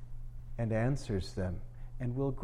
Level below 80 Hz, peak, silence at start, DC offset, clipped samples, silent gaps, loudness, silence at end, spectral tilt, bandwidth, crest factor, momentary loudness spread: -44 dBFS; -20 dBFS; 0 s; under 0.1%; under 0.1%; none; -36 LUFS; 0 s; -7.5 dB/octave; 11.5 kHz; 14 dB; 17 LU